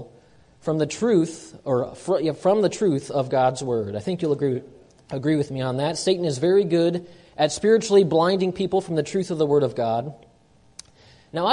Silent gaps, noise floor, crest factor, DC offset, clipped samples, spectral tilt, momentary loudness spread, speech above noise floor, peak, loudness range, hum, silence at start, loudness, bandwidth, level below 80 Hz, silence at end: none; -56 dBFS; 18 dB; under 0.1%; under 0.1%; -6 dB/octave; 9 LU; 34 dB; -4 dBFS; 4 LU; none; 0 s; -22 LUFS; 11 kHz; -60 dBFS; 0 s